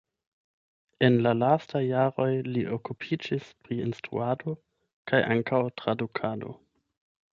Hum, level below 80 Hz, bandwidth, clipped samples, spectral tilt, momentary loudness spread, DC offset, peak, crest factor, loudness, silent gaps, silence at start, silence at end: none; -66 dBFS; 7.2 kHz; under 0.1%; -8 dB/octave; 12 LU; under 0.1%; -8 dBFS; 20 dB; -28 LUFS; 4.93-5.05 s; 1 s; 0.75 s